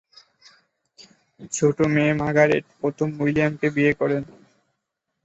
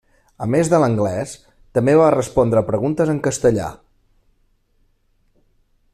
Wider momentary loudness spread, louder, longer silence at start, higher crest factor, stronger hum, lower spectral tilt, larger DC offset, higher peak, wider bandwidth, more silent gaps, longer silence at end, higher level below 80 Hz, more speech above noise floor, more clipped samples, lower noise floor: second, 9 LU vs 14 LU; second, -21 LUFS vs -18 LUFS; first, 1 s vs 0.4 s; about the same, 20 dB vs 16 dB; neither; about the same, -6 dB/octave vs -6.5 dB/octave; neither; about the same, -4 dBFS vs -2 dBFS; second, 8.2 kHz vs 14 kHz; neither; second, 0.95 s vs 2.2 s; second, -56 dBFS vs -46 dBFS; first, 58 dB vs 44 dB; neither; first, -79 dBFS vs -61 dBFS